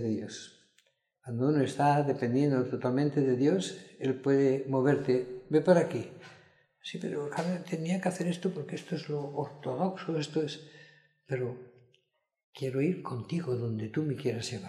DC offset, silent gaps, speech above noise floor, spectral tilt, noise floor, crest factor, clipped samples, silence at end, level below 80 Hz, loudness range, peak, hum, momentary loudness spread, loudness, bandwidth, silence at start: under 0.1%; 12.44-12.53 s; 43 dB; -7 dB/octave; -74 dBFS; 20 dB; under 0.1%; 0 s; -74 dBFS; 8 LU; -10 dBFS; none; 12 LU; -31 LUFS; 12 kHz; 0 s